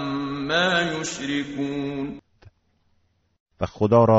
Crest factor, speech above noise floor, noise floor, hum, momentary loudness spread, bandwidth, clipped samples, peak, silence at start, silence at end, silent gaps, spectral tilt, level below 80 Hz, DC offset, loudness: 18 dB; 45 dB; -66 dBFS; none; 13 LU; 8 kHz; under 0.1%; -6 dBFS; 0 s; 0 s; 3.40-3.46 s; -4 dB/octave; -52 dBFS; under 0.1%; -24 LUFS